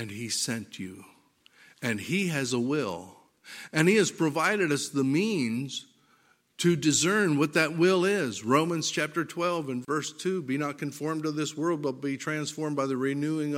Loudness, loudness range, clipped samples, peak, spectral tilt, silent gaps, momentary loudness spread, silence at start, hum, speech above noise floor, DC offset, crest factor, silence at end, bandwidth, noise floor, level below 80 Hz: -27 LUFS; 5 LU; under 0.1%; -6 dBFS; -4.5 dB/octave; none; 10 LU; 0 s; none; 37 dB; under 0.1%; 22 dB; 0 s; 16.5 kHz; -65 dBFS; -74 dBFS